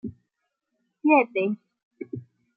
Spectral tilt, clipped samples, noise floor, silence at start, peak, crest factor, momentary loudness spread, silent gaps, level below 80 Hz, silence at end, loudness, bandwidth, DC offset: -10 dB/octave; under 0.1%; -80 dBFS; 0.05 s; -6 dBFS; 22 dB; 20 LU; 1.83-1.91 s; -70 dBFS; 0.35 s; -23 LUFS; 4.6 kHz; under 0.1%